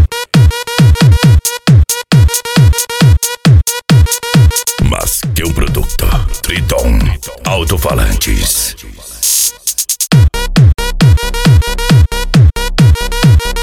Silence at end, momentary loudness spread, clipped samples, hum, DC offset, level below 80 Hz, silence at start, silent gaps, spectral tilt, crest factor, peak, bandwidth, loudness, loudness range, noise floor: 0 s; 6 LU; under 0.1%; none; 0.4%; -16 dBFS; 0 s; none; -4.5 dB/octave; 10 dB; 0 dBFS; 19 kHz; -10 LUFS; 5 LU; -29 dBFS